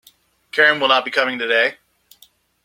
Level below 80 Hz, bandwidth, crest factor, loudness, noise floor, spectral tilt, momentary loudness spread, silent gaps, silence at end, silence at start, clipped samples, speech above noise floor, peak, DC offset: -70 dBFS; 16.5 kHz; 20 dB; -16 LUFS; -55 dBFS; -3 dB/octave; 7 LU; none; 0.9 s; 0.55 s; under 0.1%; 38 dB; 0 dBFS; under 0.1%